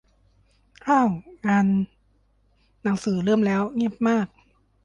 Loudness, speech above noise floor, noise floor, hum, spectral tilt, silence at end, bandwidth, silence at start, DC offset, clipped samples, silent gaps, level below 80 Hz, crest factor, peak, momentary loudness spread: -23 LUFS; 41 dB; -63 dBFS; none; -7 dB/octave; 0.6 s; 9.4 kHz; 0.85 s; under 0.1%; under 0.1%; none; -58 dBFS; 16 dB; -8 dBFS; 10 LU